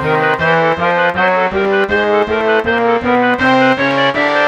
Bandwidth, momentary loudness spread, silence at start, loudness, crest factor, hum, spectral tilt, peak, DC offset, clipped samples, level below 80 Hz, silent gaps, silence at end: 10.5 kHz; 2 LU; 0 s; -12 LUFS; 12 dB; none; -6 dB/octave; 0 dBFS; under 0.1%; under 0.1%; -42 dBFS; none; 0 s